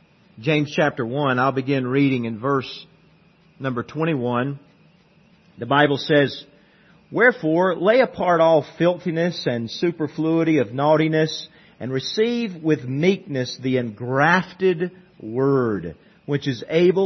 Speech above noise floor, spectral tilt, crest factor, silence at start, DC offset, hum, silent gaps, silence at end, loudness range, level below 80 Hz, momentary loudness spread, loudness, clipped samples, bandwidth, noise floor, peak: 35 dB; -6.5 dB/octave; 18 dB; 0.35 s; under 0.1%; none; none; 0 s; 5 LU; -64 dBFS; 12 LU; -21 LUFS; under 0.1%; 6.4 kHz; -55 dBFS; -2 dBFS